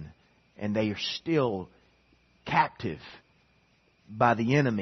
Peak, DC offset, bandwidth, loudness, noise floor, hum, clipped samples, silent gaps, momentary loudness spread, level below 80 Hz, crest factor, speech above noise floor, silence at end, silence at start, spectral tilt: -8 dBFS; under 0.1%; 6.4 kHz; -28 LUFS; -66 dBFS; none; under 0.1%; none; 22 LU; -64 dBFS; 22 dB; 39 dB; 0 s; 0 s; -6.5 dB/octave